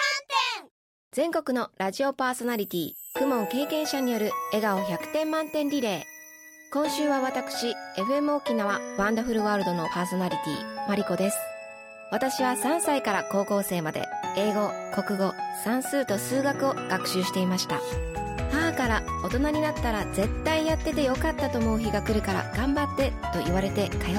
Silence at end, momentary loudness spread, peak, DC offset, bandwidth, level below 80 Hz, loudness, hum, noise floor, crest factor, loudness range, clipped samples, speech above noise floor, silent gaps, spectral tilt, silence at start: 0 s; 6 LU; -12 dBFS; under 0.1%; 17.5 kHz; -42 dBFS; -27 LUFS; none; -48 dBFS; 16 dB; 2 LU; under 0.1%; 22 dB; 0.71-1.11 s; -4.5 dB/octave; 0 s